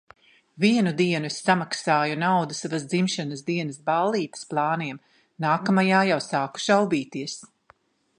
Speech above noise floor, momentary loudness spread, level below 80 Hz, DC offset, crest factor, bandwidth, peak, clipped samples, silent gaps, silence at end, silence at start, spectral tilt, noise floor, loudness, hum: 37 dB; 9 LU; -72 dBFS; under 0.1%; 20 dB; 10.5 kHz; -4 dBFS; under 0.1%; none; 0.75 s; 0.55 s; -5 dB/octave; -60 dBFS; -24 LUFS; none